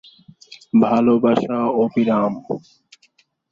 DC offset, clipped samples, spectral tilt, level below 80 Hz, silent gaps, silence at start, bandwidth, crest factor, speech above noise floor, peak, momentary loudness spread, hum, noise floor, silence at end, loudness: under 0.1%; under 0.1%; -8 dB/octave; -62 dBFS; none; 0.5 s; 7 kHz; 16 dB; 43 dB; -2 dBFS; 13 LU; none; -60 dBFS; 0.95 s; -18 LUFS